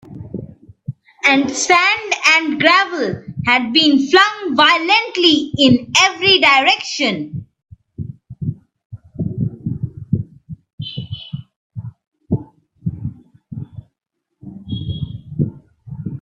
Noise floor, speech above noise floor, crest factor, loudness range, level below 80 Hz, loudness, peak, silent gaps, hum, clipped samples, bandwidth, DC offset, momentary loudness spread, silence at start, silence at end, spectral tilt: -75 dBFS; 61 dB; 18 dB; 17 LU; -48 dBFS; -14 LUFS; 0 dBFS; 8.85-8.90 s, 10.73-10.78 s, 11.56-11.70 s, 12.07-12.12 s; none; under 0.1%; 12.5 kHz; under 0.1%; 21 LU; 0.1 s; 0 s; -3.5 dB/octave